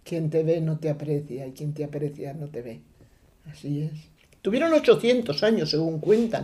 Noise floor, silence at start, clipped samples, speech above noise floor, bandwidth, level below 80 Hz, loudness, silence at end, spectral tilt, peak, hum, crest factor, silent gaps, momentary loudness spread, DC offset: -56 dBFS; 0.05 s; under 0.1%; 32 dB; 13 kHz; -60 dBFS; -25 LUFS; 0 s; -6.5 dB/octave; -6 dBFS; none; 20 dB; none; 16 LU; under 0.1%